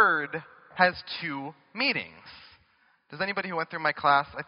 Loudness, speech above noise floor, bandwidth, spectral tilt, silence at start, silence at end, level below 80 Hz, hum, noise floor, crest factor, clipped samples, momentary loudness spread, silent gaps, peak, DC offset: -27 LUFS; 37 dB; 5.6 kHz; -1.5 dB/octave; 0 s; 0.05 s; -66 dBFS; none; -66 dBFS; 24 dB; under 0.1%; 20 LU; none; -6 dBFS; under 0.1%